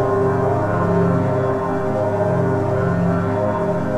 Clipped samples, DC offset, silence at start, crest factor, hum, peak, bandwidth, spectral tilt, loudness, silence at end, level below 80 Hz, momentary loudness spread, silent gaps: under 0.1%; 0.8%; 0 s; 12 dB; none; -6 dBFS; 9.2 kHz; -9 dB/octave; -19 LUFS; 0 s; -42 dBFS; 3 LU; none